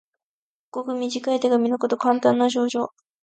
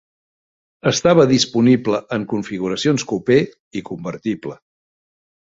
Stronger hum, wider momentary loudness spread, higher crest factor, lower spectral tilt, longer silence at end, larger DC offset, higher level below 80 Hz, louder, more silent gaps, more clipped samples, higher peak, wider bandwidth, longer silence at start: neither; second, 12 LU vs 15 LU; about the same, 18 dB vs 18 dB; about the same, -4.5 dB/octave vs -5 dB/octave; second, 0.35 s vs 0.95 s; neither; second, -76 dBFS vs -56 dBFS; second, -22 LUFS vs -18 LUFS; second, none vs 3.60-3.71 s; neither; second, -6 dBFS vs -2 dBFS; first, 9 kHz vs 8 kHz; about the same, 0.75 s vs 0.85 s